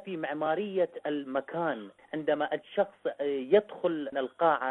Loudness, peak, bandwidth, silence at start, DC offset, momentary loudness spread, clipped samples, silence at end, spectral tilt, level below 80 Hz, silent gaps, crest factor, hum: -31 LUFS; -10 dBFS; 4.1 kHz; 0.05 s; under 0.1%; 9 LU; under 0.1%; 0 s; -8 dB/octave; -76 dBFS; none; 20 dB; none